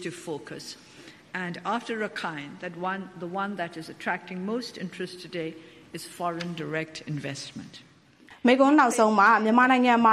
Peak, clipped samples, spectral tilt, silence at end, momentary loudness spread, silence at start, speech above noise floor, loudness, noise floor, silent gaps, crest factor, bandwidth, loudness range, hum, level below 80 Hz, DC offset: -8 dBFS; under 0.1%; -5 dB/octave; 0 s; 20 LU; 0 s; 28 dB; -26 LUFS; -54 dBFS; none; 20 dB; 14 kHz; 12 LU; none; -72 dBFS; under 0.1%